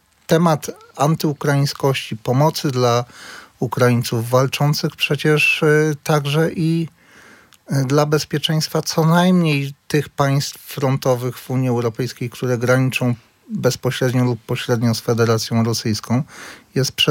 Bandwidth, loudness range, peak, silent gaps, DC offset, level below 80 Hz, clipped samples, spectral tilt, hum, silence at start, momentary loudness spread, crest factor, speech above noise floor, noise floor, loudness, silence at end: 17 kHz; 3 LU; -2 dBFS; none; under 0.1%; -60 dBFS; under 0.1%; -5.5 dB/octave; none; 0.3 s; 9 LU; 18 dB; 29 dB; -47 dBFS; -18 LUFS; 0 s